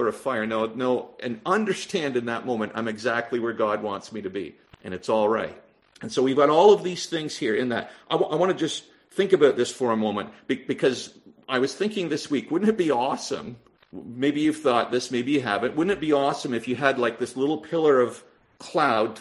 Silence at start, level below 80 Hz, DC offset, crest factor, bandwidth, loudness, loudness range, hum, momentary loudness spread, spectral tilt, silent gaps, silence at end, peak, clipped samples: 0 s; -66 dBFS; under 0.1%; 22 dB; 12 kHz; -24 LUFS; 4 LU; none; 13 LU; -5 dB/octave; none; 0 s; -2 dBFS; under 0.1%